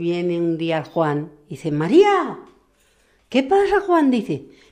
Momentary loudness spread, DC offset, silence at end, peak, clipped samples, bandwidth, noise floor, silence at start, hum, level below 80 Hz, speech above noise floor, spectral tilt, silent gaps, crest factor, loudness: 15 LU; under 0.1%; 0.25 s; -2 dBFS; under 0.1%; 10 kHz; -60 dBFS; 0 s; none; -54 dBFS; 41 dB; -7 dB/octave; none; 18 dB; -19 LUFS